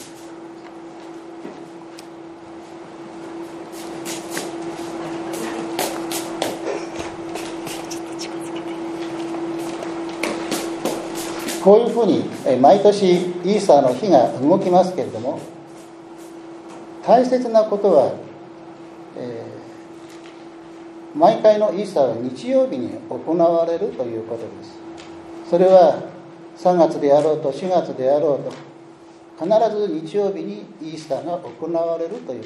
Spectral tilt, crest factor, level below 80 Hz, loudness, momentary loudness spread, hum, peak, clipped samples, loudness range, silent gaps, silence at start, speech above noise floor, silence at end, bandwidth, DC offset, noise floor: -5.5 dB/octave; 20 dB; -64 dBFS; -19 LUFS; 23 LU; none; 0 dBFS; under 0.1%; 14 LU; none; 0 s; 26 dB; 0 s; 13.5 kHz; under 0.1%; -43 dBFS